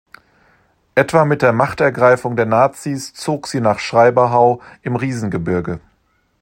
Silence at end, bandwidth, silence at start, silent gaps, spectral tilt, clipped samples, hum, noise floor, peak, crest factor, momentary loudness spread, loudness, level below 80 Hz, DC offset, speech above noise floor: 0.65 s; 16.5 kHz; 0.95 s; none; -6 dB/octave; under 0.1%; none; -61 dBFS; 0 dBFS; 16 dB; 11 LU; -16 LUFS; -52 dBFS; under 0.1%; 46 dB